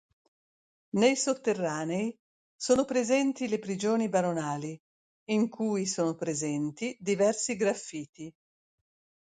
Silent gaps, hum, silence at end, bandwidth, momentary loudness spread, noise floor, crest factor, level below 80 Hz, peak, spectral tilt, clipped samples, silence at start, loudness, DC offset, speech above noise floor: 2.19-2.59 s, 4.80-5.26 s, 8.09-8.13 s; none; 0.9 s; 9.6 kHz; 12 LU; under -90 dBFS; 20 dB; -70 dBFS; -10 dBFS; -4.5 dB/octave; under 0.1%; 0.95 s; -29 LUFS; under 0.1%; over 61 dB